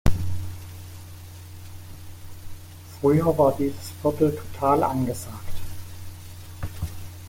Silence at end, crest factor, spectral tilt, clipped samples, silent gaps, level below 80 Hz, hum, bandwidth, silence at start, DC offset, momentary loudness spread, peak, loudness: 0 s; 20 dB; -7 dB/octave; under 0.1%; none; -38 dBFS; none; 17 kHz; 0.05 s; under 0.1%; 22 LU; -6 dBFS; -25 LUFS